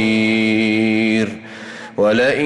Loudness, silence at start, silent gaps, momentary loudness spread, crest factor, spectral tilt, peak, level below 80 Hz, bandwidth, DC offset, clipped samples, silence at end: -16 LUFS; 0 s; none; 17 LU; 10 dB; -5.5 dB/octave; -6 dBFS; -56 dBFS; 10.5 kHz; under 0.1%; under 0.1%; 0 s